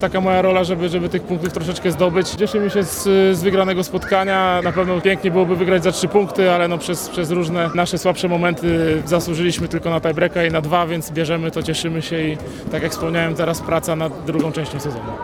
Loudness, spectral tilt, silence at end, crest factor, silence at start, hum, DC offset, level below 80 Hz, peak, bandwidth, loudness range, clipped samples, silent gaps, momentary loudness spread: -18 LUFS; -5.5 dB/octave; 0 s; 18 dB; 0 s; none; under 0.1%; -42 dBFS; -2 dBFS; 18 kHz; 4 LU; under 0.1%; none; 7 LU